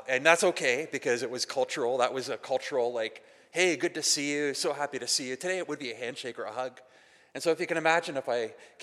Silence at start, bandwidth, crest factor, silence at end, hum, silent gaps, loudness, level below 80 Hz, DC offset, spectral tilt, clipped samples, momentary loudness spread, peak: 0 s; 14.5 kHz; 24 dB; 0 s; none; none; -29 LUFS; -88 dBFS; under 0.1%; -2 dB/octave; under 0.1%; 10 LU; -6 dBFS